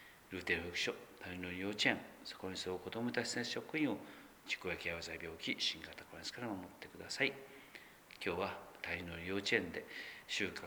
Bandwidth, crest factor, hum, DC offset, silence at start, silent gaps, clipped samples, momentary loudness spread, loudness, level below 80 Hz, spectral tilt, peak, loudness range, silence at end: over 20 kHz; 26 dB; none; under 0.1%; 0 s; none; under 0.1%; 15 LU; -40 LUFS; -70 dBFS; -3.5 dB/octave; -16 dBFS; 3 LU; 0 s